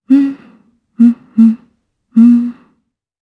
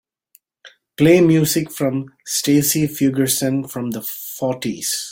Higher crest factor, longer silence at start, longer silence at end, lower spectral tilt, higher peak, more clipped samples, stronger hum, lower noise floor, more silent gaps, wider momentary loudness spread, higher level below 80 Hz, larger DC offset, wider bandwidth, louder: about the same, 12 dB vs 16 dB; second, 0.1 s vs 0.65 s; first, 0.7 s vs 0 s; first, -9 dB/octave vs -4.5 dB/octave; about the same, 0 dBFS vs -2 dBFS; neither; neither; first, -63 dBFS vs -57 dBFS; neither; first, 15 LU vs 12 LU; second, -64 dBFS vs -56 dBFS; neither; second, 3.7 kHz vs 17 kHz; first, -11 LUFS vs -18 LUFS